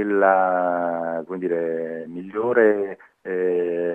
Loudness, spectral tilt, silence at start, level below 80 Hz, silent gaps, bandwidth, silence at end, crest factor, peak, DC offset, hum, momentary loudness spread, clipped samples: -22 LUFS; -9 dB/octave; 0 s; -74 dBFS; none; 3.6 kHz; 0 s; 18 dB; -4 dBFS; under 0.1%; none; 13 LU; under 0.1%